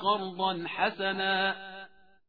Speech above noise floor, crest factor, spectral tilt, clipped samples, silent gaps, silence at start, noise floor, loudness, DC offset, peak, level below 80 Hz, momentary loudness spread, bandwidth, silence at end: 22 dB; 18 dB; -6.5 dB/octave; under 0.1%; none; 0 s; -52 dBFS; -30 LUFS; 0.1%; -14 dBFS; -74 dBFS; 13 LU; 5 kHz; 0.4 s